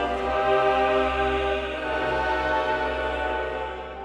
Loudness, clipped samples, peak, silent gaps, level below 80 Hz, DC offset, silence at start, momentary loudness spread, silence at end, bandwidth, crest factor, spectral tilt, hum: -24 LUFS; under 0.1%; -10 dBFS; none; -40 dBFS; under 0.1%; 0 s; 7 LU; 0 s; 10.5 kHz; 16 dB; -5.5 dB/octave; none